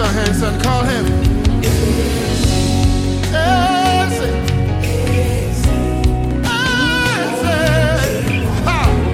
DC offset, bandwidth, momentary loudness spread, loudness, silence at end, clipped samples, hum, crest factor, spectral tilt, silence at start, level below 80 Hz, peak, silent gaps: under 0.1%; 16 kHz; 3 LU; -15 LUFS; 0 s; under 0.1%; none; 14 dB; -5.5 dB/octave; 0 s; -22 dBFS; -2 dBFS; none